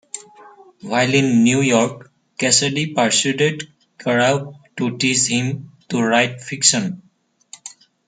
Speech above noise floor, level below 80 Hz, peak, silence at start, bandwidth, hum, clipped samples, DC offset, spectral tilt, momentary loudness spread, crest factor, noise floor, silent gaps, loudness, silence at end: 29 dB; -62 dBFS; 0 dBFS; 0.15 s; 9.6 kHz; none; under 0.1%; under 0.1%; -3.5 dB/octave; 21 LU; 20 dB; -47 dBFS; none; -17 LUFS; 0.4 s